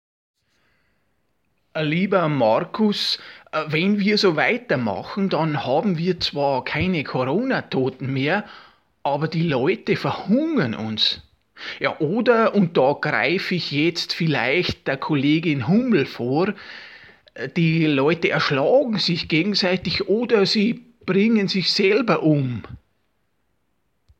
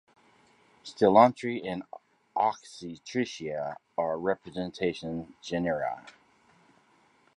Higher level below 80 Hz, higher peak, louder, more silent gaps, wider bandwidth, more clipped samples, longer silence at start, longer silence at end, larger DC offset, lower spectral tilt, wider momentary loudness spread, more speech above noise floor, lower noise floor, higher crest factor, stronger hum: first, -56 dBFS vs -66 dBFS; about the same, -4 dBFS vs -6 dBFS; first, -20 LUFS vs -29 LUFS; neither; about the same, 12 kHz vs 11 kHz; neither; first, 1.75 s vs 0.85 s; first, 1.4 s vs 1.25 s; neither; about the same, -6 dB/octave vs -6 dB/octave; second, 8 LU vs 20 LU; first, 51 dB vs 36 dB; first, -72 dBFS vs -64 dBFS; second, 18 dB vs 24 dB; neither